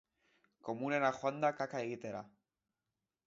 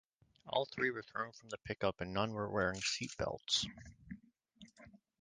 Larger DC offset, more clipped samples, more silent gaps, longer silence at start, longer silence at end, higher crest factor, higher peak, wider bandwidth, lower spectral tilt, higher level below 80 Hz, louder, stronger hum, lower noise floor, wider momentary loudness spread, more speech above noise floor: neither; neither; neither; first, 0.65 s vs 0.45 s; first, 1 s vs 0.25 s; about the same, 22 dB vs 22 dB; about the same, -18 dBFS vs -18 dBFS; second, 7.6 kHz vs 10 kHz; about the same, -4.5 dB/octave vs -3.5 dB/octave; second, -82 dBFS vs -64 dBFS; about the same, -37 LUFS vs -38 LUFS; neither; first, under -90 dBFS vs -63 dBFS; second, 13 LU vs 19 LU; first, over 53 dB vs 24 dB